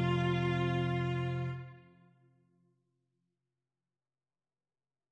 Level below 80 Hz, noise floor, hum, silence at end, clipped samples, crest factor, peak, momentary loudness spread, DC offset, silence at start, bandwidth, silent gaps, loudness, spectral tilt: -64 dBFS; under -90 dBFS; none; 3.3 s; under 0.1%; 18 dB; -20 dBFS; 11 LU; under 0.1%; 0 s; 7.8 kHz; none; -34 LUFS; -8 dB/octave